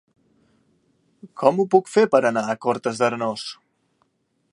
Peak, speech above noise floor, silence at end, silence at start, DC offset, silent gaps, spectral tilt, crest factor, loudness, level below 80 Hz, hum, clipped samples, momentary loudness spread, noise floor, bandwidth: -2 dBFS; 49 dB; 1 s; 1.25 s; under 0.1%; none; -5.5 dB/octave; 22 dB; -21 LUFS; -72 dBFS; none; under 0.1%; 13 LU; -69 dBFS; 11.5 kHz